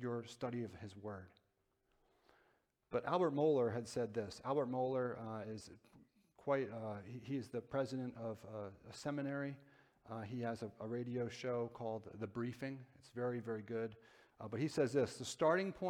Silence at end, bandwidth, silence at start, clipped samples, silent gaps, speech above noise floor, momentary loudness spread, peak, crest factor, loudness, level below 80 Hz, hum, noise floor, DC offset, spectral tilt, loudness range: 0 s; 14 kHz; 0 s; under 0.1%; none; 41 dB; 14 LU; -22 dBFS; 20 dB; -42 LUFS; -78 dBFS; none; -82 dBFS; under 0.1%; -6.5 dB/octave; 6 LU